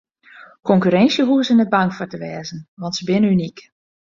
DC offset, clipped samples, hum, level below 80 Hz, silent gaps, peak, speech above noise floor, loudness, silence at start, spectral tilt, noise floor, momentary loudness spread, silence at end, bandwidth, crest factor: under 0.1%; under 0.1%; none; -58 dBFS; 2.68-2.77 s; -2 dBFS; 28 dB; -17 LUFS; 0.35 s; -6 dB/octave; -45 dBFS; 15 LU; 0.5 s; 7.4 kHz; 16 dB